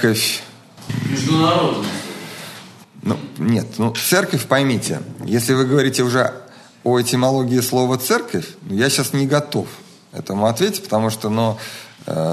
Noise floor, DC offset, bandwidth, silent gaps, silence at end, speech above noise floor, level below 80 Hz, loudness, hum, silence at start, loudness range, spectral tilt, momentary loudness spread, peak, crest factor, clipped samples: -40 dBFS; under 0.1%; 13.5 kHz; none; 0 s; 22 dB; -60 dBFS; -19 LUFS; none; 0 s; 3 LU; -4.5 dB/octave; 15 LU; 0 dBFS; 18 dB; under 0.1%